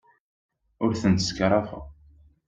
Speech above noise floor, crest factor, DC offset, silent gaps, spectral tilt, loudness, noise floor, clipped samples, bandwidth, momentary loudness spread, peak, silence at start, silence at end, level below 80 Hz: 32 dB; 20 dB; under 0.1%; none; -5.5 dB/octave; -24 LUFS; -56 dBFS; under 0.1%; 9 kHz; 13 LU; -8 dBFS; 0.8 s; 0.55 s; -50 dBFS